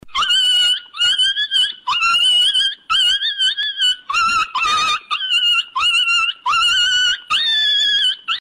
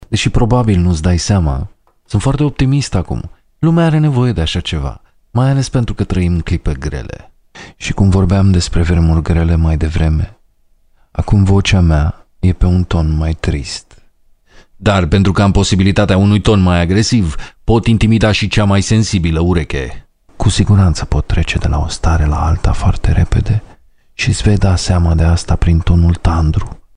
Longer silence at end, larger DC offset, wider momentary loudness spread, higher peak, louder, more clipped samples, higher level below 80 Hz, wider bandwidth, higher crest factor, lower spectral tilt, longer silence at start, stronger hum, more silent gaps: second, 0 s vs 0.2 s; neither; second, 5 LU vs 10 LU; second, -8 dBFS vs 0 dBFS; about the same, -14 LUFS vs -13 LUFS; neither; second, -54 dBFS vs -20 dBFS; first, 16 kHz vs 10.5 kHz; about the same, 10 dB vs 12 dB; second, 2.5 dB/octave vs -6 dB/octave; about the same, 0.05 s vs 0.1 s; neither; neither